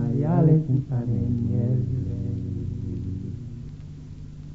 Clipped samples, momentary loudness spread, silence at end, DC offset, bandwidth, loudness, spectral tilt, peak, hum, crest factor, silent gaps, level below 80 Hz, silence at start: under 0.1%; 21 LU; 0 s; under 0.1%; 4.3 kHz; -25 LUFS; -11.5 dB/octave; -8 dBFS; none; 16 dB; none; -44 dBFS; 0 s